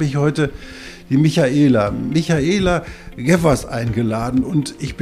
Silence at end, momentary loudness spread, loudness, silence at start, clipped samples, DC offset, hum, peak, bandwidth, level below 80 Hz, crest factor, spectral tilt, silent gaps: 0 s; 10 LU; -17 LUFS; 0 s; under 0.1%; under 0.1%; none; -2 dBFS; 14.5 kHz; -36 dBFS; 16 dB; -6.5 dB/octave; none